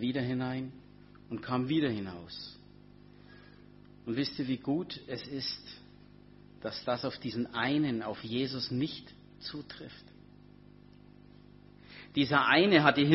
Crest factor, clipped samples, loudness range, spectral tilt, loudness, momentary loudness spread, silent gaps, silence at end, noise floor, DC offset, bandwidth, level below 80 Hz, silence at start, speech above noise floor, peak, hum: 28 dB; under 0.1%; 6 LU; -8 dB/octave; -32 LUFS; 22 LU; none; 0 s; -56 dBFS; under 0.1%; 6 kHz; -64 dBFS; 0 s; 24 dB; -6 dBFS; 50 Hz at -60 dBFS